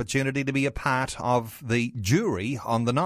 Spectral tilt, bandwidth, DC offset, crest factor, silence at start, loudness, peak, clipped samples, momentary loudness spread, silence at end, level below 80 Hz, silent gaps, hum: -5.5 dB/octave; 16 kHz; under 0.1%; 16 dB; 0 s; -26 LUFS; -8 dBFS; under 0.1%; 3 LU; 0 s; -46 dBFS; none; none